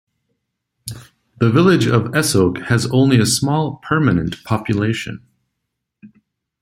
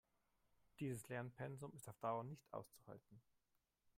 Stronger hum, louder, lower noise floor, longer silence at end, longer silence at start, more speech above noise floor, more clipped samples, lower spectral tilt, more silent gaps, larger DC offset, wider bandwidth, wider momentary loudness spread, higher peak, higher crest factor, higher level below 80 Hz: neither; first, -16 LUFS vs -51 LUFS; second, -77 dBFS vs -87 dBFS; second, 0.55 s vs 0.75 s; about the same, 0.85 s vs 0.8 s; first, 61 dB vs 36 dB; neither; about the same, -5.5 dB/octave vs -6.5 dB/octave; neither; neither; about the same, 16 kHz vs 16 kHz; first, 19 LU vs 15 LU; first, 0 dBFS vs -32 dBFS; about the same, 18 dB vs 22 dB; first, -48 dBFS vs -84 dBFS